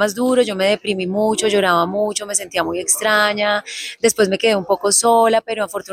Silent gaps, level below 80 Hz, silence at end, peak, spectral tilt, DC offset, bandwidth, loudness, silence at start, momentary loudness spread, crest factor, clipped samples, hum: none; -58 dBFS; 0 s; -2 dBFS; -2.5 dB/octave; under 0.1%; 16 kHz; -17 LUFS; 0 s; 7 LU; 14 dB; under 0.1%; none